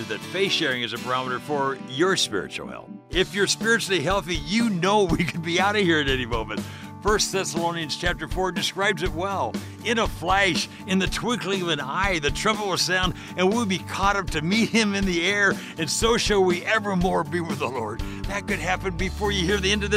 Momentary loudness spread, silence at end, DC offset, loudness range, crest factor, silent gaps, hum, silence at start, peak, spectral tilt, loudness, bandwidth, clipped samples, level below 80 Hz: 8 LU; 0 s; under 0.1%; 3 LU; 16 dB; none; none; 0 s; -8 dBFS; -3.5 dB/octave; -23 LUFS; 16 kHz; under 0.1%; -38 dBFS